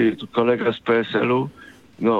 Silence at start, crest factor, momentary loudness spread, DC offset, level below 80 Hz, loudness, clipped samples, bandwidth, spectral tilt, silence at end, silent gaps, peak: 0 s; 16 dB; 5 LU; under 0.1%; -64 dBFS; -21 LUFS; under 0.1%; 7.2 kHz; -7.5 dB/octave; 0 s; none; -4 dBFS